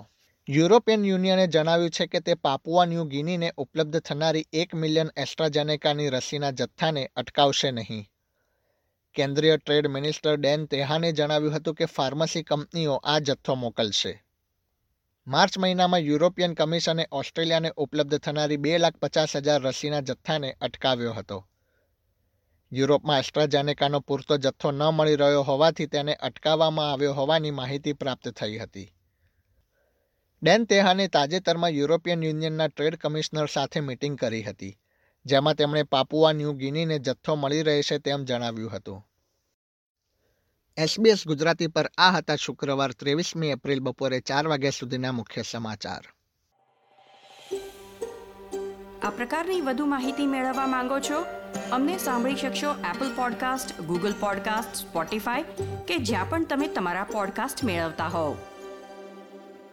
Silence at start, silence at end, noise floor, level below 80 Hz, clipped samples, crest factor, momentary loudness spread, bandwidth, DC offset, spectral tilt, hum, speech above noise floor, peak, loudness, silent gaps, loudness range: 0 s; 0.05 s; -76 dBFS; -62 dBFS; under 0.1%; 22 dB; 12 LU; 16.5 kHz; under 0.1%; -5 dB/octave; none; 51 dB; -4 dBFS; -25 LUFS; 39.54-39.95 s; 6 LU